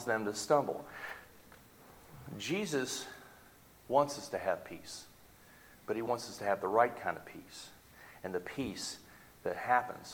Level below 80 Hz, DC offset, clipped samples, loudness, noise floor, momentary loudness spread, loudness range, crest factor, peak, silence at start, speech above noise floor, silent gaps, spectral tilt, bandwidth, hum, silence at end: -70 dBFS; under 0.1%; under 0.1%; -35 LUFS; -60 dBFS; 22 LU; 2 LU; 24 dB; -14 dBFS; 0 s; 25 dB; none; -4 dB/octave; 19 kHz; none; 0 s